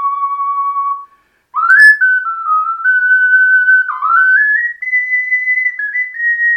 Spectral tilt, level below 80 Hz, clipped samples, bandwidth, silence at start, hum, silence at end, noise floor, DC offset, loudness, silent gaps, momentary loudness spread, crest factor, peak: 3.5 dB/octave; -74 dBFS; 0.2%; 16 kHz; 0 s; none; 0 s; -48 dBFS; under 0.1%; -10 LUFS; none; 11 LU; 12 dB; 0 dBFS